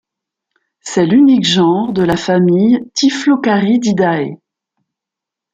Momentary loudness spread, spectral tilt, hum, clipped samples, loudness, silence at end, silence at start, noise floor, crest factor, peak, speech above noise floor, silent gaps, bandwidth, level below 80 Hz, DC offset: 8 LU; -5.5 dB/octave; none; under 0.1%; -12 LUFS; 1.2 s; 0.85 s; -84 dBFS; 12 dB; -2 dBFS; 72 dB; none; 9 kHz; -50 dBFS; under 0.1%